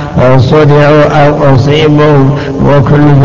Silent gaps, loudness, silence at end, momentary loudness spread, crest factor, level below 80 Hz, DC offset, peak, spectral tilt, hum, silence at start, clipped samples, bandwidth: none; -5 LUFS; 0 s; 3 LU; 4 dB; -26 dBFS; 7%; 0 dBFS; -8 dB/octave; none; 0 s; 5%; 7.2 kHz